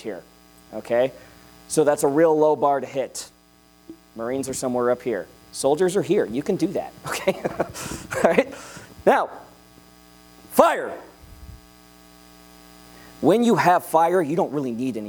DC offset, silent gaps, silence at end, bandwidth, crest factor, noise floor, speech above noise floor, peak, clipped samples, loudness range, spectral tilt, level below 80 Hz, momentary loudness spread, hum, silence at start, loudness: under 0.1%; none; 0 s; over 20 kHz; 24 dB; -55 dBFS; 33 dB; 0 dBFS; under 0.1%; 4 LU; -5 dB/octave; -56 dBFS; 17 LU; none; 0 s; -22 LUFS